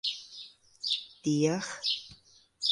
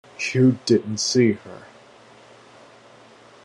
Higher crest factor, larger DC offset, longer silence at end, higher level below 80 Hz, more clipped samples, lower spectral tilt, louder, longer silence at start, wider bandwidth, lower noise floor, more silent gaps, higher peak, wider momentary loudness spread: about the same, 20 dB vs 18 dB; neither; second, 0 s vs 1.85 s; about the same, -72 dBFS vs -68 dBFS; neither; about the same, -4 dB/octave vs -5 dB/octave; second, -31 LUFS vs -20 LUFS; second, 0.05 s vs 0.2 s; about the same, 11.5 kHz vs 11 kHz; first, -59 dBFS vs -49 dBFS; neither; second, -14 dBFS vs -6 dBFS; about the same, 18 LU vs 19 LU